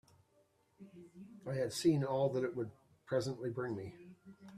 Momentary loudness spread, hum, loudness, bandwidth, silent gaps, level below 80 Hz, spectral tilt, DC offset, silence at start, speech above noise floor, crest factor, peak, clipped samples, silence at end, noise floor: 24 LU; none; -37 LUFS; 14.5 kHz; none; -76 dBFS; -6 dB/octave; under 0.1%; 0.8 s; 36 dB; 18 dB; -20 dBFS; under 0.1%; 0 s; -73 dBFS